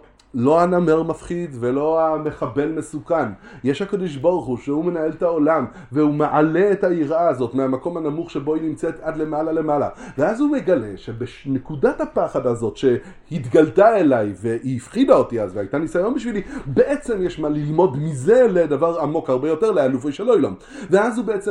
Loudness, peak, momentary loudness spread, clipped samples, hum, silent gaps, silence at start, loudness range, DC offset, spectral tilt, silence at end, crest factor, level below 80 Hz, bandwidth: -20 LUFS; 0 dBFS; 10 LU; under 0.1%; none; none; 0.35 s; 4 LU; under 0.1%; -7.5 dB/octave; 0 s; 18 dB; -48 dBFS; 11 kHz